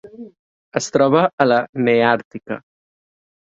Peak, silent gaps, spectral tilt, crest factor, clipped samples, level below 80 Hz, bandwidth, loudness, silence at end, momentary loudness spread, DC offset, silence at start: 0 dBFS; 0.39-0.72 s, 1.33-1.38 s, 1.69-1.73 s, 2.25-2.31 s; -5 dB/octave; 20 dB; under 0.1%; -62 dBFS; 8 kHz; -17 LUFS; 0.95 s; 15 LU; under 0.1%; 0.05 s